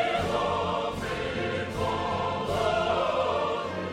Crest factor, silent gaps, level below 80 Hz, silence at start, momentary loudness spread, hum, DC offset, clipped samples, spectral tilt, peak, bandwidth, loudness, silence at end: 14 dB; none; -50 dBFS; 0 s; 5 LU; none; under 0.1%; under 0.1%; -5 dB/octave; -14 dBFS; 16 kHz; -28 LUFS; 0 s